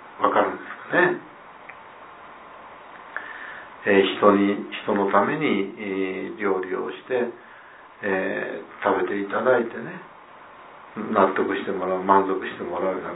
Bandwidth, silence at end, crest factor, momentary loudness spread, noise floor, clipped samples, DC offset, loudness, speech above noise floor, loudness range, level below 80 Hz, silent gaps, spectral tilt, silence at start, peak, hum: 4 kHz; 0 s; 22 dB; 23 LU; -46 dBFS; under 0.1%; under 0.1%; -23 LUFS; 23 dB; 5 LU; -70 dBFS; none; -9.5 dB/octave; 0 s; -2 dBFS; none